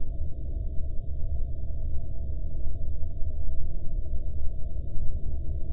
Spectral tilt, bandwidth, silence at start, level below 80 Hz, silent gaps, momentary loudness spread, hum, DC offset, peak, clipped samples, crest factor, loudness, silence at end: -13 dB/octave; 0.7 kHz; 0 s; -30 dBFS; none; 2 LU; none; under 0.1%; -10 dBFS; under 0.1%; 12 dB; -36 LUFS; 0 s